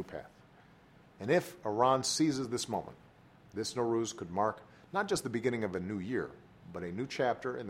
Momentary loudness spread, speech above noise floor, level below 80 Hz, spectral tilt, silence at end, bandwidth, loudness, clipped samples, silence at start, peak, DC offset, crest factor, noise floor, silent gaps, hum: 16 LU; 27 dB; -68 dBFS; -4.5 dB/octave; 0 s; 16 kHz; -34 LUFS; under 0.1%; 0 s; -14 dBFS; under 0.1%; 20 dB; -60 dBFS; none; none